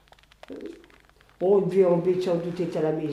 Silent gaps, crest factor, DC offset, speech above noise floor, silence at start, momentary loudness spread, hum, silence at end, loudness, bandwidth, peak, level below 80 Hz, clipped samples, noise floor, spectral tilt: none; 16 dB; under 0.1%; 33 dB; 0.5 s; 19 LU; none; 0 s; -24 LUFS; 11 kHz; -10 dBFS; -62 dBFS; under 0.1%; -56 dBFS; -8.5 dB/octave